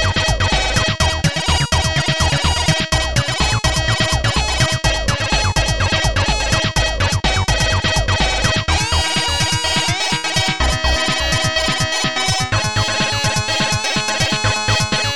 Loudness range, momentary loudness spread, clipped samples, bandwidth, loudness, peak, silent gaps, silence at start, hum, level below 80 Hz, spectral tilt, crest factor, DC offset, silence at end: 0 LU; 1 LU; under 0.1%; 17 kHz; -16 LUFS; 0 dBFS; none; 0 s; none; -24 dBFS; -3 dB/octave; 16 dB; 1%; 0 s